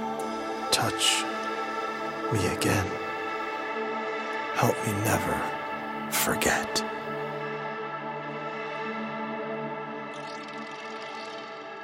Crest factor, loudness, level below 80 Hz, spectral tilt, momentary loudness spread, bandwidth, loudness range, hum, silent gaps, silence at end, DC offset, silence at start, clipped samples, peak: 22 dB; -29 LUFS; -58 dBFS; -3.5 dB/octave; 12 LU; 16.5 kHz; 7 LU; none; none; 0 s; under 0.1%; 0 s; under 0.1%; -8 dBFS